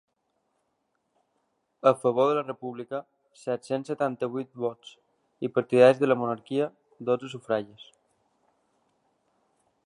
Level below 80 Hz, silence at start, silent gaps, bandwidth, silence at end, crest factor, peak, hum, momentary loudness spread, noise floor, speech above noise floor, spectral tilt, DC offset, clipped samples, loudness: -80 dBFS; 1.85 s; none; 11 kHz; 2.05 s; 22 dB; -6 dBFS; none; 17 LU; -76 dBFS; 50 dB; -6.5 dB/octave; under 0.1%; under 0.1%; -27 LUFS